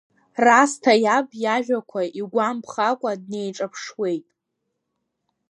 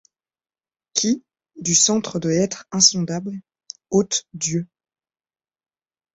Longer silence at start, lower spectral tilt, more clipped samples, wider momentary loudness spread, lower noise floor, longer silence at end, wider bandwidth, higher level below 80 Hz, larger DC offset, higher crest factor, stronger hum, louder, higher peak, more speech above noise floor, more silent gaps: second, 0.35 s vs 0.95 s; about the same, -3.5 dB/octave vs -3 dB/octave; neither; second, 14 LU vs 19 LU; second, -78 dBFS vs under -90 dBFS; second, 1.3 s vs 1.5 s; first, 11.5 kHz vs 8.4 kHz; second, -78 dBFS vs -60 dBFS; neither; about the same, 22 dB vs 22 dB; neither; about the same, -21 LUFS vs -20 LUFS; about the same, 0 dBFS vs -2 dBFS; second, 57 dB vs over 69 dB; neither